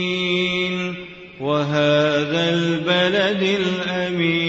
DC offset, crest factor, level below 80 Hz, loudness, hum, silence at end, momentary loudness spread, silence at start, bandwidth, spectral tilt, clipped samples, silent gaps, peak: under 0.1%; 12 dB; -56 dBFS; -19 LUFS; none; 0 s; 9 LU; 0 s; 8 kHz; -5.5 dB/octave; under 0.1%; none; -8 dBFS